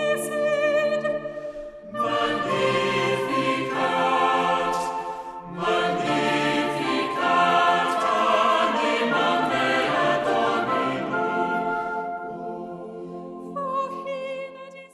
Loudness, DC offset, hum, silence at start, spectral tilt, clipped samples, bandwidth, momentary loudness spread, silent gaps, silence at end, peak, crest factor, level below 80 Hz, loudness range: -23 LUFS; under 0.1%; none; 0 s; -4.5 dB/octave; under 0.1%; 14 kHz; 14 LU; none; 0.05 s; -8 dBFS; 16 dB; -60 dBFS; 7 LU